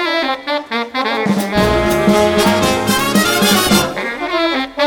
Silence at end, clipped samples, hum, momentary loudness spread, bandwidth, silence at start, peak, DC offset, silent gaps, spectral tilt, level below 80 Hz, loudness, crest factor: 0 s; under 0.1%; none; 7 LU; over 20 kHz; 0 s; 0 dBFS; under 0.1%; none; -4 dB/octave; -34 dBFS; -14 LUFS; 14 dB